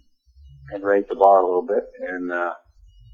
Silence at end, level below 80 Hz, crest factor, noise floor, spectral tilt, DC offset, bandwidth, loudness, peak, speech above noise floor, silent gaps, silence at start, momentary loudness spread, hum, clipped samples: 0.6 s; -54 dBFS; 20 dB; -51 dBFS; -7.5 dB/octave; under 0.1%; 6.8 kHz; -20 LUFS; -2 dBFS; 31 dB; none; 0.65 s; 16 LU; none; under 0.1%